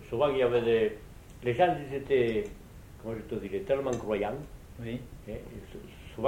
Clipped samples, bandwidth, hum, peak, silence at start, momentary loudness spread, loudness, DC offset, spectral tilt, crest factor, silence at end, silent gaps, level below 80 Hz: under 0.1%; 17 kHz; none; -12 dBFS; 0 s; 20 LU; -30 LUFS; under 0.1%; -6.5 dB/octave; 18 dB; 0 s; none; -50 dBFS